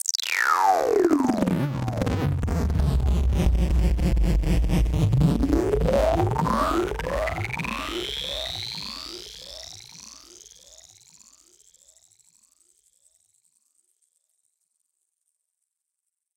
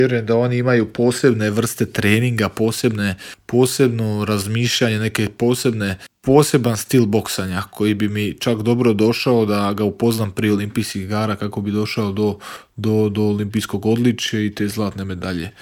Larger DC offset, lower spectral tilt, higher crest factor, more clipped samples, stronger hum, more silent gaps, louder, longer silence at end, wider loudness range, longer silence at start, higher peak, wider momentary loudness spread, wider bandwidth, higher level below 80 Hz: neither; about the same, -5.5 dB/octave vs -5.5 dB/octave; about the same, 20 dB vs 18 dB; neither; neither; neither; second, -24 LUFS vs -19 LUFS; first, 6.2 s vs 0.1 s; first, 15 LU vs 3 LU; about the same, 0.05 s vs 0 s; second, -6 dBFS vs 0 dBFS; first, 17 LU vs 7 LU; about the same, 17 kHz vs 18.5 kHz; first, -30 dBFS vs -54 dBFS